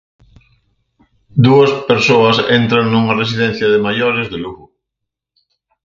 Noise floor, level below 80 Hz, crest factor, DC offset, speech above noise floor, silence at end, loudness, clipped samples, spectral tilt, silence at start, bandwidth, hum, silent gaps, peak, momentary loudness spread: -79 dBFS; -48 dBFS; 14 dB; under 0.1%; 67 dB; 1.3 s; -12 LUFS; under 0.1%; -6.5 dB/octave; 1.35 s; 7.4 kHz; none; none; 0 dBFS; 10 LU